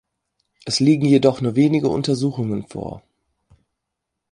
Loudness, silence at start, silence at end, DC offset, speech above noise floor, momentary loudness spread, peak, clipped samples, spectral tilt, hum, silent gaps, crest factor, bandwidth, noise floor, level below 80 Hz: -18 LUFS; 0.65 s; 1.35 s; under 0.1%; 62 dB; 16 LU; -2 dBFS; under 0.1%; -6.5 dB/octave; none; none; 18 dB; 11 kHz; -80 dBFS; -54 dBFS